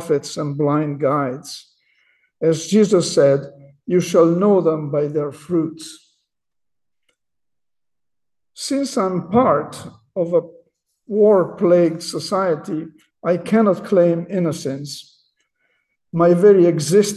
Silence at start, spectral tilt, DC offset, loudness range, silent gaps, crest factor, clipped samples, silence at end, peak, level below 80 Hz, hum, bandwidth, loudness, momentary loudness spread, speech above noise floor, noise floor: 0 s; -6 dB/octave; under 0.1%; 10 LU; none; 16 dB; under 0.1%; 0 s; -2 dBFS; -62 dBFS; none; 12.5 kHz; -18 LUFS; 16 LU; 72 dB; -89 dBFS